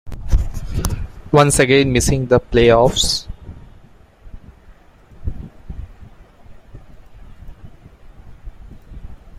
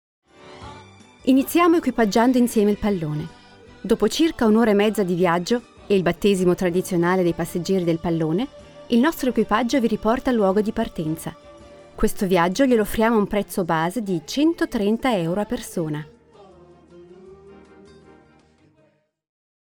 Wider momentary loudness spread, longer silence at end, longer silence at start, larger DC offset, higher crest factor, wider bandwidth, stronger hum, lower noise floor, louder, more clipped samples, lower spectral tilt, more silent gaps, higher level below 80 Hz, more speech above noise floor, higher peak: first, 25 LU vs 10 LU; second, 0 s vs 2.25 s; second, 0.05 s vs 0.45 s; neither; about the same, 20 dB vs 16 dB; second, 16 kHz vs 20 kHz; neither; second, -45 dBFS vs -62 dBFS; first, -15 LUFS vs -21 LUFS; neither; second, -4.5 dB/octave vs -6 dB/octave; neither; first, -28 dBFS vs -44 dBFS; second, 32 dB vs 42 dB; first, 0 dBFS vs -6 dBFS